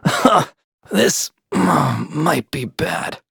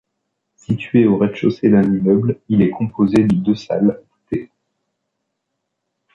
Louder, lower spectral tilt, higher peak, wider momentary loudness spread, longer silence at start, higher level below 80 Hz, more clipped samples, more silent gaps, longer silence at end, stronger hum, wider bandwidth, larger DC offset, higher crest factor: about the same, -18 LUFS vs -17 LUFS; second, -4.5 dB/octave vs -9 dB/octave; about the same, 0 dBFS vs -2 dBFS; second, 9 LU vs 12 LU; second, 0.05 s vs 0.7 s; about the same, -52 dBFS vs -50 dBFS; neither; first, 0.64-0.78 s vs none; second, 0.15 s vs 1.7 s; neither; first, over 20 kHz vs 7.4 kHz; neither; about the same, 18 dB vs 16 dB